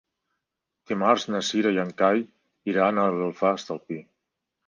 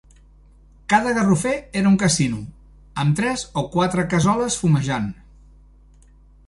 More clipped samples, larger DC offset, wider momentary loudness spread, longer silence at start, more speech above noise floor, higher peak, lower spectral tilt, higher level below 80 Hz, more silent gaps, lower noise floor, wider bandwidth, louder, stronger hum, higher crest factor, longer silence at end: neither; neither; about the same, 13 LU vs 12 LU; about the same, 0.9 s vs 0.9 s; first, 60 dB vs 30 dB; about the same, -6 dBFS vs -4 dBFS; about the same, -5 dB/octave vs -5 dB/octave; second, -72 dBFS vs -46 dBFS; neither; first, -83 dBFS vs -50 dBFS; second, 10 kHz vs 11.5 kHz; second, -24 LUFS vs -20 LUFS; second, none vs 50 Hz at -40 dBFS; about the same, 20 dB vs 18 dB; second, 0.65 s vs 1.35 s